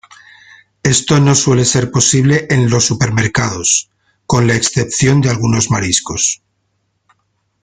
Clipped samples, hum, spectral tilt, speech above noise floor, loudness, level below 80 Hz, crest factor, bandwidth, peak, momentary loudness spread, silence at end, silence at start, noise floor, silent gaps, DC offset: under 0.1%; none; -4 dB/octave; 53 dB; -12 LUFS; -42 dBFS; 14 dB; 9.6 kHz; 0 dBFS; 5 LU; 1.25 s; 0.85 s; -65 dBFS; none; under 0.1%